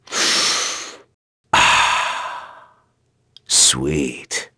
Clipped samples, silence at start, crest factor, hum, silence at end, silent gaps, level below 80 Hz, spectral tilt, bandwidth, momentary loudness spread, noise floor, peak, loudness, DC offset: under 0.1%; 0.1 s; 20 dB; none; 0.1 s; 1.14-1.44 s; -46 dBFS; -1 dB/octave; 11 kHz; 16 LU; -64 dBFS; 0 dBFS; -16 LUFS; under 0.1%